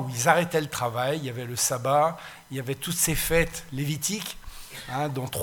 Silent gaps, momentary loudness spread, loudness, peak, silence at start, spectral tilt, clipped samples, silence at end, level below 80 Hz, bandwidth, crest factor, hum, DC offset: none; 14 LU; -26 LUFS; -4 dBFS; 0 s; -3.5 dB/octave; under 0.1%; 0 s; -44 dBFS; 19 kHz; 22 dB; none; under 0.1%